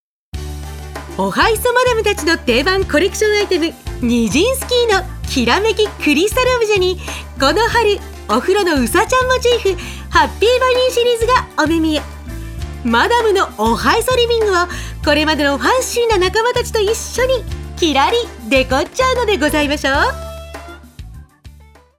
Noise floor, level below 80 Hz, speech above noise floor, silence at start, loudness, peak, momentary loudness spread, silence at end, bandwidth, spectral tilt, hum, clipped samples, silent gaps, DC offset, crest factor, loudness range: -43 dBFS; -30 dBFS; 28 dB; 0.35 s; -15 LUFS; 0 dBFS; 12 LU; 0.5 s; 17.5 kHz; -4 dB/octave; none; under 0.1%; none; under 0.1%; 16 dB; 1 LU